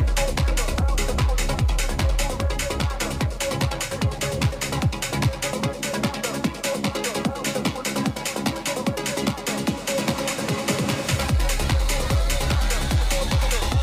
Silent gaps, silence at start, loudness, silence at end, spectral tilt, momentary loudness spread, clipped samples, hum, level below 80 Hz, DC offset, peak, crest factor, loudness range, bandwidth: none; 0 s; -24 LUFS; 0 s; -4.5 dB/octave; 3 LU; under 0.1%; none; -26 dBFS; under 0.1%; -8 dBFS; 14 dB; 2 LU; 16 kHz